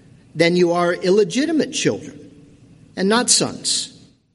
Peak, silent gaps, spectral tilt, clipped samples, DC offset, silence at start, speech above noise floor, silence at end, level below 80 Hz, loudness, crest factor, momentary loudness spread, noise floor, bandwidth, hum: 0 dBFS; none; -3.5 dB/octave; under 0.1%; under 0.1%; 0.35 s; 29 dB; 0.45 s; -60 dBFS; -18 LUFS; 20 dB; 16 LU; -47 dBFS; 11.5 kHz; none